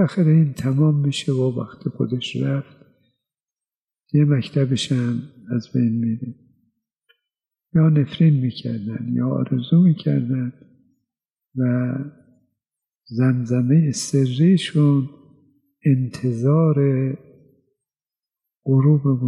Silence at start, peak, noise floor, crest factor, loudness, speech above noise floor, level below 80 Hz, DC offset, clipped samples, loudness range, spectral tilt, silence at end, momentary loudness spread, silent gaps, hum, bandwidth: 0 s; -6 dBFS; under -90 dBFS; 14 dB; -20 LUFS; over 71 dB; -62 dBFS; under 0.1%; under 0.1%; 5 LU; -7.5 dB/octave; 0 s; 11 LU; 3.42-3.47 s, 3.75-3.88 s, 11.32-11.36 s, 12.95-13.01 s; none; 11 kHz